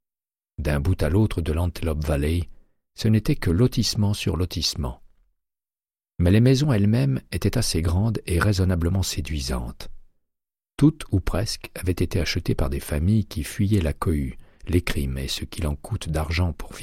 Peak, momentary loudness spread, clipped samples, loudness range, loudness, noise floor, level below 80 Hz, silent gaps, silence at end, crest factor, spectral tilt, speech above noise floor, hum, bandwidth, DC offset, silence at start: -6 dBFS; 9 LU; under 0.1%; 4 LU; -24 LUFS; under -90 dBFS; -32 dBFS; none; 0 s; 18 dB; -6 dB/octave; over 68 dB; none; 16 kHz; under 0.1%; 0.6 s